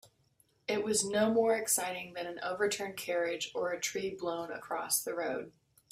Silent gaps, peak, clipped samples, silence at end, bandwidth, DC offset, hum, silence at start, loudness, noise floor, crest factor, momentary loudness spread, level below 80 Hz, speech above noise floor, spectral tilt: none; -16 dBFS; under 0.1%; 0.4 s; 16 kHz; under 0.1%; none; 0.05 s; -33 LUFS; -71 dBFS; 18 dB; 11 LU; -74 dBFS; 37 dB; -2.5 dB/octave